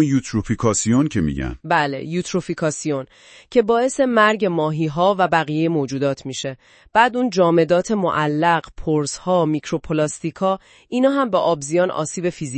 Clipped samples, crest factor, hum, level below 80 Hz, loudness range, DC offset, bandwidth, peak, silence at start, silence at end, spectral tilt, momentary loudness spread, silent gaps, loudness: under 0.1%; 18 dB; none; -44 dBFS; 2 LU; under 0.1%; 8.8 kHz; 0 dBFS; 0 s; 0 s; -5 dB/octave; 8 LU; none; -19 LUFS